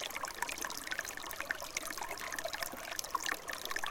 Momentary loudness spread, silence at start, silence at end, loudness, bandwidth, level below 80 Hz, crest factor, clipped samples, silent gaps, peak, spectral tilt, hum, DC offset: 3 LU; 0 s; 0 s; -39 LUFS; 17 kHz; -62 dBFS; 26 dB; under 0.1%; none; -14 dBFS; 0 dB/octave; none; under 0.1%